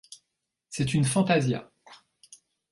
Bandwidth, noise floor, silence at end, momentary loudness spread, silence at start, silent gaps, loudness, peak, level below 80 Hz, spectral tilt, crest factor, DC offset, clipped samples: 11.5 kHz; -82 dBFS; 0.75 s; 11 LU; 0.1 s; none; -26 LUFS; -10 dBFS; -60 dBFS; -5.5 dB/octave; 18 dB; under 0.1%; under 0.1%